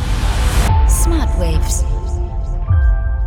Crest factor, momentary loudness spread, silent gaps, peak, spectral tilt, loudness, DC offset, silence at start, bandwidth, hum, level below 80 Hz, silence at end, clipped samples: 12 dB; 8 LU; none; -2 dBFS; -5 dB/octave; -17 LUFS; under 0.1%; 0 s; 17 kHz; none; -14 dBFS; 0 s; under 0.1%